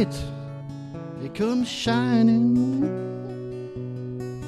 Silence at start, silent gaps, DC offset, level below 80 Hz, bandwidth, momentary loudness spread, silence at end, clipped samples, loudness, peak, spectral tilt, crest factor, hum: 0 s; none; under 0.1%; -50 dBFS; 11.5 kHz; 17 LU; 0 s; under 0.1%; -25 LUFS; -8 dBFS; -6.5 dB/octave; 16 dB; none